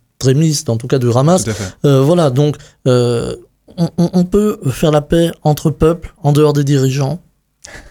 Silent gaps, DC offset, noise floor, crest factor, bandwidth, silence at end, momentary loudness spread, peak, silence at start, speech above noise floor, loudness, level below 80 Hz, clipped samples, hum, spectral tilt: none; under 0.1%; -38 dBFS; 12 dB; 17 kHz; 0.1 s; 8 LU; 0 dBFS; 0.2 s; 26 dB; -14 LUFS; -36 dBFS; under 0.1%; none; -6.5 dB/octave